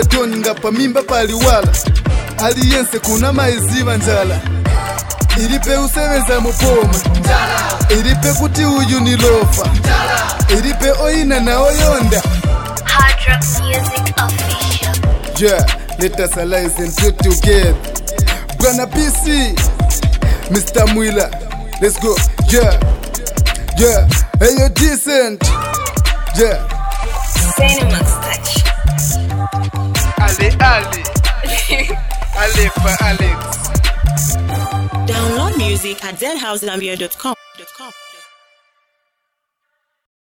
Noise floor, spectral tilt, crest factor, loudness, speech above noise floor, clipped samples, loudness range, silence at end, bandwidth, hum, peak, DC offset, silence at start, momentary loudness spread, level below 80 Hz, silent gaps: -72 dBFS; -4 dB/octave; 12 dB; -14 LUFS; 60 dB; under 0.1%; 4 LU; 2.15 s; 18.5 kHz; none; 0 dBFS; under 0.1%; 0 s; 8 LU; -18 dBFS; none